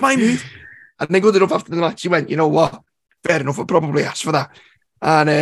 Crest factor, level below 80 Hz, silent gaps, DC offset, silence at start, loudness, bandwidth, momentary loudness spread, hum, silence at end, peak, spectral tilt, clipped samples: 18 dB; -58 dBFS; none; under 0.1%; 0 s; -18 LUFS; 12.5 kHz; 10 LU; none; 0 s; 0 dBFS; -5.5 dB/octave; under 0.1%